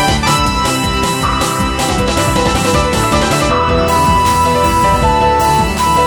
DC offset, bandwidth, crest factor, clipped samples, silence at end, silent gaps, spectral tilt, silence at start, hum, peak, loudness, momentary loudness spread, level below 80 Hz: under 0.1%; over 20 kHz; 12 dB; under 0.1%; 0 s; none; -4 dB/octave; 0 s; none; 0 dBFS; -12 LUFS; 3 LU; -22 dBFS